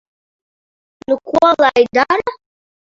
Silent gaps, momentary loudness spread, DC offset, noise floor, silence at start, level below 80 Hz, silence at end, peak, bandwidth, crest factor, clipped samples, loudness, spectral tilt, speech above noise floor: none; 12 LU; under 0.1%; under -90 dBFS; 1.1 s; -56 dBFS; 0.55 s; 0 dBFS; 7.6 kHz; 16 dB; under 0.1%; -14 LUFS; -4.5 dB/octave; over 77 dB